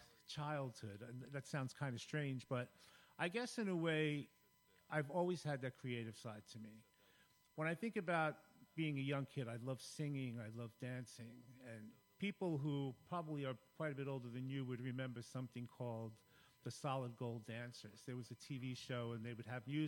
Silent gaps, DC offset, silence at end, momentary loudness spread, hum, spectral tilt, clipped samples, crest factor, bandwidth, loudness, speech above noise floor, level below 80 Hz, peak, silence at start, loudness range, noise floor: none; under 0.1%; 0 s; 14 LU; none; -6 dB/octave; under 0.1%; 20 dB; 16.5 kHz; -46 LUFS; 29 dB; -84 dBFS; -26 dBFS; 0 s; 5 LU; -74 dBFS